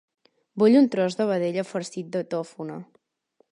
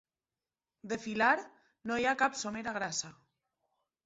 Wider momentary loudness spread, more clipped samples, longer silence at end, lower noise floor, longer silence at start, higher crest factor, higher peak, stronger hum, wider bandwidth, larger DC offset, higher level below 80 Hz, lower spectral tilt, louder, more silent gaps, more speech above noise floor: first, 18 LU vs 12 LU; neither; second, 0.7 s vs 0.95 s; second, -67 dBFS vs under -90 dBFS; second, 0.55 s vs 0.85 s; second, 16 dB vs 22 dB; first, -8 dBFS vs -14 dBFS; neither; first, 11 kHz vs 8 kHz; neither; about the same, -76 dBFS vs -72 dBFS; first, -6.5 dB/octave vs -1.5 dB/octave; first, -23 LUFS vs -33 LUFS; neither; second, 44 dB vs over 57 dB